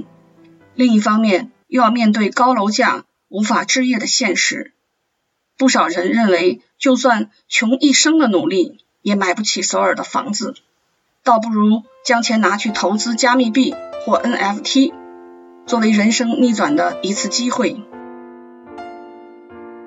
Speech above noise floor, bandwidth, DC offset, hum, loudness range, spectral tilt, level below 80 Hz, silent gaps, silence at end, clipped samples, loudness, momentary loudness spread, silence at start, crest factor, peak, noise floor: 55 dB; 8 kHz; under 0.1%; none; 3 LU; -3.5 dB/octave; -70 dBFS; none; 0 s; under 0.1%; -16 LUFS; 13 LU; 0 s; 16 dB; 0 dBFS; -70 dBFS